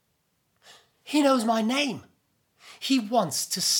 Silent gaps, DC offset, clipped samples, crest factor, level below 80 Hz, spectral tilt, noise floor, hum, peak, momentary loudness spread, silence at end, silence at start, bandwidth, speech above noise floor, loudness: none; under 0.1%; under 0.1%; 16 dB; -80 dBFS; -2.5 dB/octave; -73 dBFS; none; -10 dBFS; 8 LU; 0 s; 0.7 s; 18.5 kHz; 48 dB; -25 LUFS